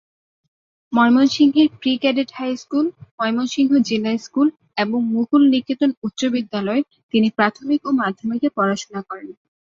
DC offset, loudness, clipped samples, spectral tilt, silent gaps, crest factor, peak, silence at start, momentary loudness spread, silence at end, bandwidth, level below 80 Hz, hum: under 0.1%; -19 LUFS; under 0.1%; -5 dB/octave; 3.11-3.18 s, 5.97-6.02 s, 7.03-7.09 s; 18 dB; -2 dBFS; 0.9 s; 9 LU; 0.4 s; 7.6 kHz; -64 dBFS; none